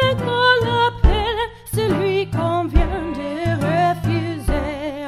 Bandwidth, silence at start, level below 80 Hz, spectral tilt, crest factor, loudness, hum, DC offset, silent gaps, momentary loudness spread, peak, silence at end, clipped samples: 14 kHz; 0 s; -26 dBFS; -6 dB/octave; 18 dB; -19 LUFS; none; 0.1%; none; 8 LU; -2 dBFS; 0 s; under 0.1%